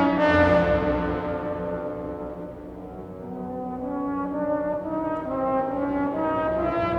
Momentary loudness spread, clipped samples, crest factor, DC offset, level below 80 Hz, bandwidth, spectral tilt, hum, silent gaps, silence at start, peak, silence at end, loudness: 17 LU; under 0.1%; 18 dB; under 0.1%; -44 dBFS; 7 kHz; -8 dB/octave; none; none; 0 s; -8 dBFS; 0 s; -25 LUFS